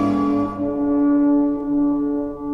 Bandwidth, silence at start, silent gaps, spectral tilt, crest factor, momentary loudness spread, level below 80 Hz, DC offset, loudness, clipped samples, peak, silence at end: 5.6 kHz; 0 s; none; -9 dB/octave; 10 dB; 6 LU; -46 dBFS; under 0.1%; -19 LUFS; under 0.1%; -8 dBFS; 0 s